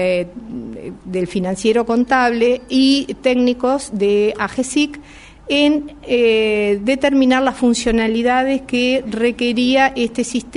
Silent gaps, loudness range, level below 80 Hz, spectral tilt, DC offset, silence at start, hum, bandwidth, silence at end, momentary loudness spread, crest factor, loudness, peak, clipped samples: none; 2 LU; -42 dBFS; -4.5 dB/octave; under 0.1%; 0 s; none; 11 kHz; 0 s; 8 LU; 16 dB; -16 LUFS; 0 dBFS; under 0.1%